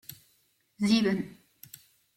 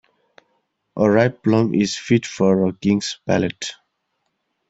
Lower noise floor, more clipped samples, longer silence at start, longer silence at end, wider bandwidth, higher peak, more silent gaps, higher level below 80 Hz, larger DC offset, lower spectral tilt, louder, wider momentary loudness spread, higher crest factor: about the same, -70 dBFS vs -73 dBFS; neither; second, 0.1 s vs 0.95 s; about the same, 0.85 s vs 0.95 s; first, 16.5 kHz vs 8 kHz; second, -12 dBFS vs -2 dBFS; neither; second, -68 dBFS vs -56 dBFS; neither; about the same, -5.5 dB/octave vs -6 dB/octave; second, -27 LUFS vs -19 LUFS; first, 24 LU vs 8 LU; about the same, 20 dB vs 18 dB